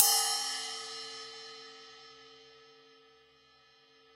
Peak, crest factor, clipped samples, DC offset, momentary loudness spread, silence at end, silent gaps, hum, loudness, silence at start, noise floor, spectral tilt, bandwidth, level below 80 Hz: -2 dBFS; 36 dB; under 0.1%; under 0.1%; 26 LU; 1.65 s; none; none; -32 LUFS; 0 s; -64 dBFS; 3 dB/octave; 16 kHz; -84 dBFS